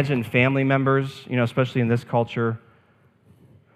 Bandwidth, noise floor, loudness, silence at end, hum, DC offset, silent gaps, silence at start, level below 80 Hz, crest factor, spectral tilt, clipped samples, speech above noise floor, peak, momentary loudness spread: 13 kHz; -59 dBFS; -22 LUFS; 1.2 s; none; under 0.1%; none; 0 s; -64 dBFS; 18 dB; -8 dB/octave; under 0.1%; 37 dB; -6 dBFS; 7 LU